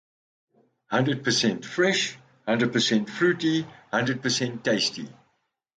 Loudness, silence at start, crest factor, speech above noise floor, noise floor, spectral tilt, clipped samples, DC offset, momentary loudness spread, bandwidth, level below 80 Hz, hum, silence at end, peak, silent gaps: -25 LUFS; 0.9 s; 16 dB; 48 dB; -73 dBFS; -4 dB/octave; under 0.1%; under 0.1%; 7 LU; 9.4 kHz; -68 dBFS; none; 0.65 s; -10 dBFS; none